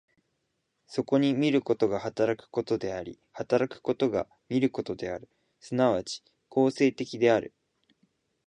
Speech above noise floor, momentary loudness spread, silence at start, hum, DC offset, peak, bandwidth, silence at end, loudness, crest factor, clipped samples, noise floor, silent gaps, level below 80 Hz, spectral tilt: 51 dB; 13 LU; 0.9 s; none; under 0.1%; -10 dBFS; 9.8 kHz; 1 s; -28 LUFS; 18 dB; under 0.1%; -78 dBFS; none; -64 dBFS; -6 dB/octave